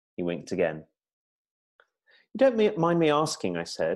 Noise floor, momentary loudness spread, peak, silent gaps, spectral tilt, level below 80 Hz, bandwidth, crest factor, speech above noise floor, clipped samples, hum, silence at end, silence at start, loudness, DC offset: -65 dBFS; 10 LU; -10 dBFS; 1.13-1.45 s, 1.51-1.79 s; -5.5 dB/octave; -66 dBFS; 12.5 kHz; 18 dB; 39 dB; under 0.1%; none; 0 s; 0.2 s; -26 LUFS; under 0.1%